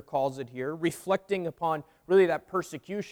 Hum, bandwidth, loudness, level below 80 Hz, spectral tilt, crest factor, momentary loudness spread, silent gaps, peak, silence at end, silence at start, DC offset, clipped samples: none; 17.5 kHz; -29 LUFS; -68 dBFS; -6 dB/octave; 18 dB; 12 LU; none; -12 dBFS; 0 s; 0.1 s; under 0.1%; under 0.1%